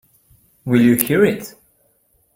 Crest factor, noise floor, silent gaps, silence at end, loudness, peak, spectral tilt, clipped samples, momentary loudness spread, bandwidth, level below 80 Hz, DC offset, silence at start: 20 dB; -61 dBFS; none; 0.85 s; -15 LUFS; 0 dBFS; -6 dB/octave; under 0.1%; 19 LU; 16.5 kHz; -56 dBFS; under 0.1%; 0.65 s